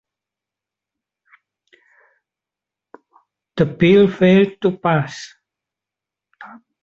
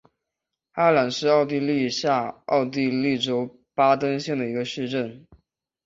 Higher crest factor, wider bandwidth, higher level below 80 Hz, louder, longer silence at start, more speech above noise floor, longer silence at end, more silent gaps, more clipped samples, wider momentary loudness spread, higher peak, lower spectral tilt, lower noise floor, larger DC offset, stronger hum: about the same, 18 dB vs 20 dB; about the same, 7.6 kHz vs 7.8 kHz; first, -56 dBFS vs -66 dBFS; first, -16 LUFS vs -23 LUFS; first, 3.55 s vs 0.75 s; first, 72 dB vs 62 dB; second, 0.35 s vs 0.65 s; neither; neither; first, 19 LU vs 8 LU; about the same, -2 dBFS vs -4 dBFS; first, -7.5 dB/octave vs -5.5 dB/octave; about the same, -87 dBFS vs -85 dBFS; neither; neither